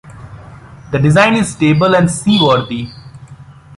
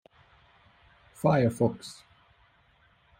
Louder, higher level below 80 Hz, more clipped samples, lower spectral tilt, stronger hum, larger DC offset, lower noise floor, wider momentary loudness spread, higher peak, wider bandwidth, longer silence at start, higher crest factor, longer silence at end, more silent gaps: first, -12 LUFS vs -27 LUFS; first, -42 dBFS vs -62 dBFS; neither; second, -5.5 dB/octave vs -7.5 dB/octave; neither; neither; second, -37 dBFS vs -64 dBFS; second, 13 LU vs 20 LU; first, 0 dBFS vs -10 dBFS; second, 11.5 kHz vs 16 kHz; second, 0.05 s vs 1.25 s; second, 14 dB vs 22 dB; second, 0.25 s vs 1.25 s; neither